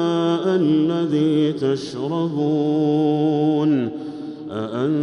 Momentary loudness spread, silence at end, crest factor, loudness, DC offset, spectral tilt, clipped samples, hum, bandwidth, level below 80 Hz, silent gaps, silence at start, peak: 10 LU; 0 s; 10 dB; -20 LUFS; under 0.1%; -8 dB/octave; under 0.1%; none; 8.6 kHz; -66 dBFS; none; 0 s; -8 dBFS